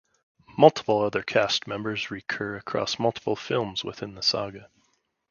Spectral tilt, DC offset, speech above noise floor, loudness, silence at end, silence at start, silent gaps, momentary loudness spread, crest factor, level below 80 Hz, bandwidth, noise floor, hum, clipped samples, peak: -4.5 dB/octave; under 0.1%; 45 dB; -25 LUFS; 0.65 s; 0.5 s; none; 12 LU; 26 dB; -62 dBFS; 7.2 kHz; -71 dBFS; none; under 0.1%; -2 dBFS